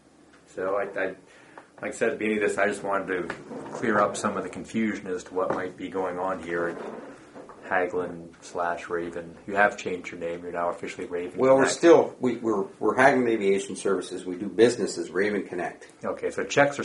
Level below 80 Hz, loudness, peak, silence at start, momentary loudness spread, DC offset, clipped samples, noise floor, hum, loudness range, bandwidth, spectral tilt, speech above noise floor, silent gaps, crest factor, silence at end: -64 dBFS; -26 LUFS; -4 dBFS; 0.55 s; 16 LU; under 0.1%; under 0.1%; -55 dBFS; none; 8 LU; 11.5 kHz; -4.5 dB/octave; 29 dB; none; 22 dB; 0 s